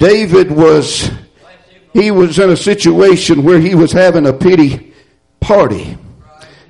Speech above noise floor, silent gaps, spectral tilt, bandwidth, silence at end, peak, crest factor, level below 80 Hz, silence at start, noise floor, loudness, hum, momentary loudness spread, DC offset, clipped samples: 40 dB; none; -6 dB/octave; 11.5 kHz; 0.7 s; 0 dBFS; 10 dB; -36 dBFS; 0 s; -48 dBFS; -9 LUFS; none; 13 LU; under 0.1%; under 0.1%